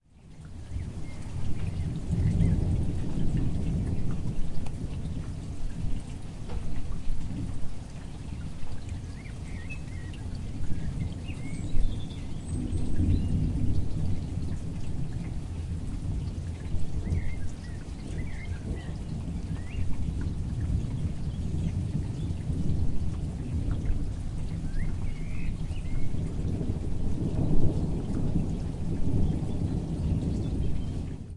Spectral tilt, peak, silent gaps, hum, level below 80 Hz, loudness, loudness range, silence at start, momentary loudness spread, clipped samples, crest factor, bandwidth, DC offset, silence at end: -8 dB/octave; -10 dBFS; none; none; -34 dBFS; -33 LUFS; 8 LU; 0.25 s; 10 LU; under 0.1%; 18 dB; 11 kHz; under 0.1%; 0 s